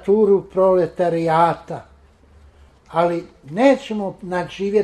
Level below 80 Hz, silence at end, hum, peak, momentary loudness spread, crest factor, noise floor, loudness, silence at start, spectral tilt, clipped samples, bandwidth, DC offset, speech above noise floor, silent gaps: -52 dBFS; 0 s; none; -2 dBFS; 12 LU; 16 dB; -50 dBFS; -19 LUFS; 0.05 s; -7 dB/octave; under 0.1%; 11.5 kHz; under 0.1%; 32 dB; none